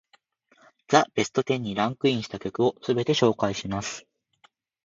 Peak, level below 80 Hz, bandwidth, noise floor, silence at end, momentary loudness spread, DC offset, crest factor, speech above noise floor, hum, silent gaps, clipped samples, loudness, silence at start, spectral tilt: -4 dBFS; -60 dBFS; 7.8 kHz; -63 dBFS; 0.85 s; 10 LU; under 0.1%; 24 dB; 39 dB; none; none; under 0.1%; -25 LUFS; 0.9 s; -5 dB/octave